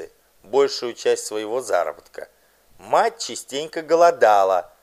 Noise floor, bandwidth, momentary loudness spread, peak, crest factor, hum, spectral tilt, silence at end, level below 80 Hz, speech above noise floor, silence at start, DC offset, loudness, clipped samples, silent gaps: -45 dBFS; 15 kHz; 14 LU; -2 dBFS; 18 dB; none; -2.5 dB/octave; 0.15 s; -68 dBFS; 25 dB; 0 s; under 0.1%; -20 LUFS; under 0.1%; none